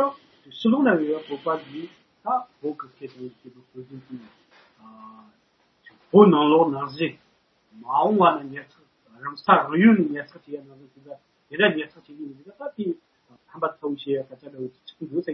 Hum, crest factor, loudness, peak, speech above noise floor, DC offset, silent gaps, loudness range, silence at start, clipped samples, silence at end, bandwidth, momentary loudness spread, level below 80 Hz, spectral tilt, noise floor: none; 24 dB; -22 LUFS; 0 dBFS; 40 dB; under 0.1%; none; 14 LU; 0 s; under 0.1%; 0 s; 5.8 kHz; 23 LU; -74 dBFS; -9 dB/octave; -63 dBFS